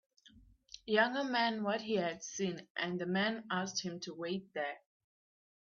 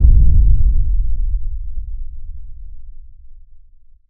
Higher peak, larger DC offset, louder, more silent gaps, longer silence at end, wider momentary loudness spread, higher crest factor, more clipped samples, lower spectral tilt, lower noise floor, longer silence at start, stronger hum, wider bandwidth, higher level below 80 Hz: second, -16 dBFS vs 0 dBFS; neither; second, -36 LUFS vs -19 LUFS; first, 2.70-2.75 s vs none; first, 0.95 s vs 0.8 s; second, 11 LU vs 24 LU; first, 22 dB vs 14 dB; neither; second, -3 dB/octave vs -16.5 dB/octave; first, -63 dBFS vs -42 dBFS; first, 0.25 s vs 0 s; neither; first, 7.4 kHz vs 0.6 kHz; second, -76 dBFS vs -16 dBFS